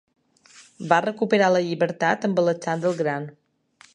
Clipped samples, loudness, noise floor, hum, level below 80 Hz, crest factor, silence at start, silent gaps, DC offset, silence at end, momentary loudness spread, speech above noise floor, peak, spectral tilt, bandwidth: under 0.1%; -22 LUFS; -56 dBFS; none; -74 dBFS; 22 dB; 0.6 s; none; under 0.1%; 0.65 s; 9 LU; 34 dB; -2 dBFS; -6 dB/octave; 10.5 kHz